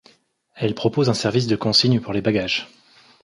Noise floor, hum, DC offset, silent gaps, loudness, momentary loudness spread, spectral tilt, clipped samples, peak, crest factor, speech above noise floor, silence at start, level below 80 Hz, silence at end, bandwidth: -58 dBFS; none; under 0.1%; none; -20 LUFS; 9 LU; -5.5 dB/octave; under 0.1%; -2 dBFS; 20 dB; 38 dB; 0.55 s; -54 dBFS; 0.55 s; 11.5 kHz